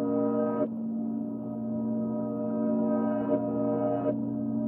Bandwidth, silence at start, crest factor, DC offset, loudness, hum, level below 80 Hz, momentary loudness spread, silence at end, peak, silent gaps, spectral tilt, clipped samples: 3.1 kHz; 0 s; 14 dB; under 0.1%; -30 LUFS; none; -68 dBFS; 6 LU; 0 s; -14 dBFS; none; -12.5 dB/octave; under 0.1%